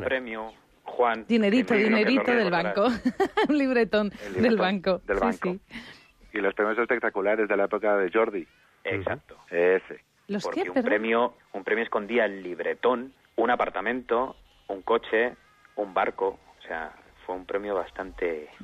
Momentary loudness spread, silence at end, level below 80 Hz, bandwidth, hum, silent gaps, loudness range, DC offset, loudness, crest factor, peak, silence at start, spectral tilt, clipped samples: 14 LU; 0 s; -58 dBFS; 11 kHz; none; none; 6 LU; under 0.1%; -26 LUFS; 14 dB; -12 dBFS; 0 s; -6 dB/octave; under 0.1%